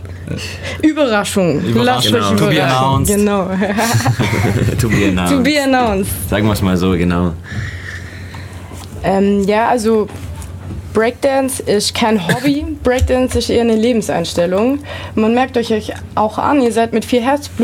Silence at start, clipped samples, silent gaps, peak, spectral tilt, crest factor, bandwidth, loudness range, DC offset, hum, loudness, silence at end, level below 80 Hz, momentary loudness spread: 0 s; under 0.1%; none; -2 dBFS; -5.5 dB/octave; 12 dB; 17 kHz; 4 LU; under 0.1%; none; -14 LUFS; 0 s; -32 dBFS; 12 LU